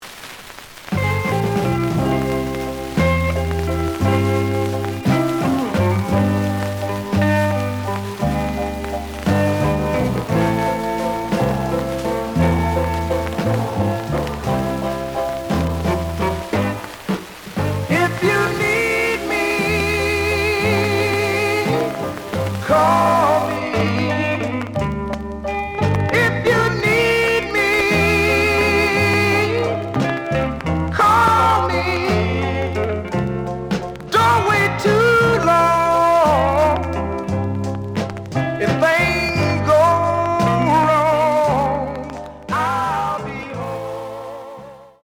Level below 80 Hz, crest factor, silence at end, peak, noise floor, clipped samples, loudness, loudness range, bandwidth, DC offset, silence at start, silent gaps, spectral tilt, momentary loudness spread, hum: -38 dBFS; 14 dB; 0.15 s; -4 dBFS; -38 dBFS; under 0.1%; -18 LUFS; 5 LU; over 20 kHz; under 0.1%; 0 s; none; -6 dB/octave; 10 LU; none